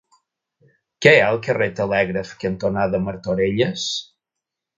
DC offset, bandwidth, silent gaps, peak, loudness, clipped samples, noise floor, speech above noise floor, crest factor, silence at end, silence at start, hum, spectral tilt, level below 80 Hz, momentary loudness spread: under 0.1%; 9.2 kHz; none; 0 dBFS; -19 LUFS; under 0.1%; -84 dBFS; 65 dB; 22 dB; 0.75 s; 1 s; none; -5 dB/octave; -50 dBFS; 11 LU